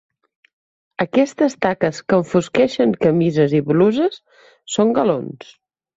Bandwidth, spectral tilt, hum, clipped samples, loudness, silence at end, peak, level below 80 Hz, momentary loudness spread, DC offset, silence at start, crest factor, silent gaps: 8 kHz; -6.5 dB/octave; none; under 0.1%; -18 LUFS; 0.55 s; -2 dBFS; -58 dBFS; 9 LU; under 0.1%; 1 s; 16 dB; none